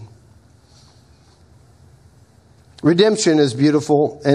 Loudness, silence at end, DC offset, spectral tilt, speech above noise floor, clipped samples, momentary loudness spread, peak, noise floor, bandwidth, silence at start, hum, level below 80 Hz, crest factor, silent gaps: -16 LUFS; 0 s; under 0.1%; -5.5 dB/octave; 36 dB; under 0.1%; 4 LU; 0 dBFS; -50 dBFS; 11 kHz; 0 s; none; -58 dBFS; 18 dB; none